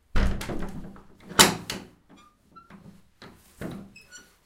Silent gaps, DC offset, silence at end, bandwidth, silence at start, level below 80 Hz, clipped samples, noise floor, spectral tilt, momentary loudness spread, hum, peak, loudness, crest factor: none; under 0.1%; 0.25 s; 16 kHz; 0.15 s; -36 dBFS; under 0.1%; -56 dBFS; -2.5 dB/octave; 27 LU; none; 0 dBFS; -24 LUFS; 28 dB